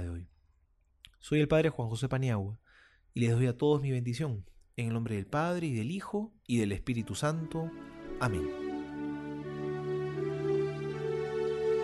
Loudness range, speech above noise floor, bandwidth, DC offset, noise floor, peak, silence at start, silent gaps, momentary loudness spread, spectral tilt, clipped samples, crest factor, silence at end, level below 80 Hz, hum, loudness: 5 LU; 38 dB; 12 kHz; under 0.1%; -69 dBFS; -16 dBFS; 0 s; none; 12 LU; -7 dB/octave; under 0.1%; 16 dB; 0 s; -56 dBFS; none; -33 LUFS